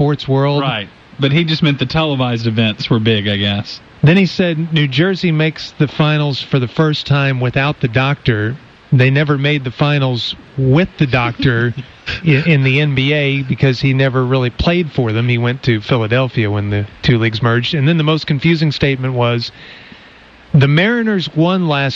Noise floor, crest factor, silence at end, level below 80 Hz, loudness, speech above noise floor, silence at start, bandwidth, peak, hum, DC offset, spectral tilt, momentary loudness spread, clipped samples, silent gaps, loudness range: -41 dBFS; 12 dB; 0 s; -40 dBFS; -14 LUFS; 27 dB; 0 s; 7 kHz; -2 dBFS; none; under 0.1%; -7.5 dB/octave; 6 LU; under 0.1%; none; 1 LU